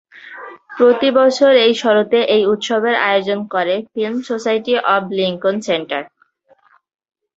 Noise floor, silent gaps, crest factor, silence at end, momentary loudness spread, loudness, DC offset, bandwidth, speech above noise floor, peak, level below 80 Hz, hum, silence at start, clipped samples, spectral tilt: -55 dBFS; none; 14 dB; 1.3 s; 13 LU; -15 LUFS; under 0.1%; 7.8 kHz; 40 dB; -2 dBFS; -64 dBFS; none; 0.15 s; under 0.1%; -4.5 dB/octave